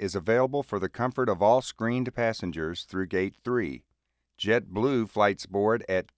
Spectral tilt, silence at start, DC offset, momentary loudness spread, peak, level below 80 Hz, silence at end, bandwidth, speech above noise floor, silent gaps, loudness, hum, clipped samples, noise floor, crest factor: -6 dB/octave; 0 s; under 0.1%; 8 LU; -8 dBFS; -54 dBFS; 0.15 s; 8 kHz; 51 dB; none; -27 LUFS; none; under 0.1%; -78 dBFS; 18 dB